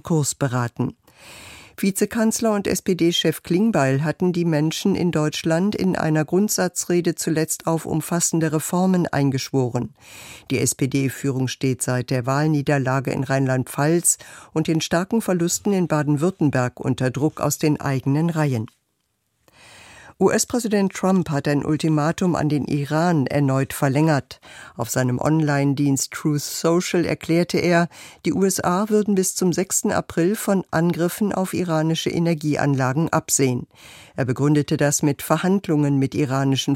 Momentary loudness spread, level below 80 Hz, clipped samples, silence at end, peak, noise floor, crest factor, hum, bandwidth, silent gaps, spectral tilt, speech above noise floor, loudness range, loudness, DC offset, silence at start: 5 LU; -54 dBFS; under 0.1%; 0 s; -4 dBFS; -72 dBFS; 18 dB; none; 16.5 kHz; none; -5 dB/octave; 51 dB; 2 LU; -21 LUFS; under 0.1%; 0.05 s